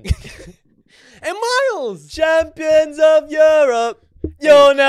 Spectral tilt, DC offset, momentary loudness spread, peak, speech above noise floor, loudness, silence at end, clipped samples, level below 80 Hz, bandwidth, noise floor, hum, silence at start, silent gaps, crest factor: -4 dB/octave; under 0.1%; 15 LU; -2 dBFS; 39 dB; -14 LUFS; 0 s; under 0.1%; -36 dBFS; 12.5 kHz; -52 dBFS; none; 0.05 s; none; 14 dB